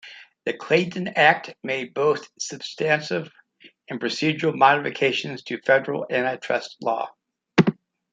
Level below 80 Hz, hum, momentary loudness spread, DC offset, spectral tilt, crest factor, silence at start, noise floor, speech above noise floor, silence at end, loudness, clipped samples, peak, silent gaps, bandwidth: -64 dBFS; none; 13 LU; under 0.1%; -5 dB/octave; 22 dB; 0.05 s; -52 dBFS; 29 dB; 0.4 s; -23 LUFS; under 0.1%; -2 dBFS; none; 9.4 kHz